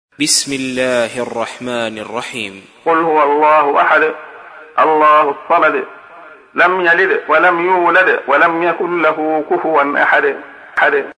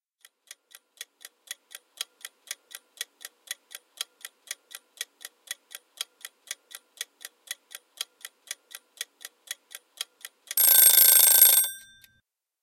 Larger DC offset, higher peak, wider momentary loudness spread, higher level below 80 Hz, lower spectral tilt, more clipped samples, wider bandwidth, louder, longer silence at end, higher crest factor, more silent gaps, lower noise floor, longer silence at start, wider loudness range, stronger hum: neither; about the same, 0 dBFS vs 0 dBFS; second, 12 LU vs 27 LU; first, -62 dBFS vs -82 dBFS; first, -2.5 dB/octave vs 5 dB/octave; neither; second, 11 kHz vs 17.5 kHz; first, -13 LUFS vs -16 LUFS; second, 0.05 s vs 0.85 s; second, 14 dB vs 28 dB; neither; second, -38 dBFS vs -72 dBFS; second, 0.2 s vs 2.5 s; second, 3 LU vs 22 LU; neither